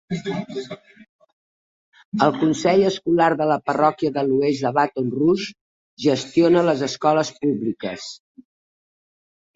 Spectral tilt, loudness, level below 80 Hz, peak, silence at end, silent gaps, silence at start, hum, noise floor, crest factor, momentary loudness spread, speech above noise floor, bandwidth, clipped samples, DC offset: -6 dB/octave; -20 LUFS; -62 dBFS; -2 dBFS; 1.4 s; 1.09-1.19 s, 1.33-1.92 s, 2.05-2.12 s, 5.61-5.97 s; 0.1 s; none; under -90 dBFS; 20 dB; 13 LU; over 70 dB; 8 kHz; under 0.1%; under 0.1%